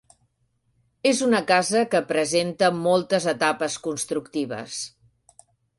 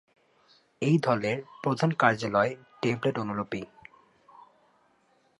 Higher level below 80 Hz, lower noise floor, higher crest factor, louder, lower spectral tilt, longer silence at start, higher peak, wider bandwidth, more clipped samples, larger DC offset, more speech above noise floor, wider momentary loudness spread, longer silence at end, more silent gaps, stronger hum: about the same, -66 dBFS vs -68 dBFS; about the same, -70 dBFS vs -67 dBFS; about the same, 18 dB vs 22 dB; first, -23 LUFS vs -28 LUFS; second, -3.5 dB/octave vs -6.5 dB/octave; first, 1.05 s vs 0.8 s; about the same, -6 dBFS vs -8 dBFS; about the same, 11.5 kHz vs 11.5 kHz; neither; neither; first, 47 dB vs 40 dB; about the same, 10 LU vs 10 LU; second, 0.9 s vs 1.75 s; neither; neither